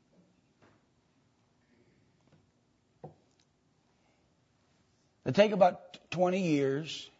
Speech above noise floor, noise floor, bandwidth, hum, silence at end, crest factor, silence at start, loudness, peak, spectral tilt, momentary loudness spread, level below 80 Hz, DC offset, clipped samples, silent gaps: 43 dB; -72 dBFS; 8 kHz; none; 0.15 s; 24 dB; 3.05 s; -29 LUFS; -12 dBFS; -6 dB/octave; 16 LU; -76 dBFS; under 0.1%; under 0.1%; none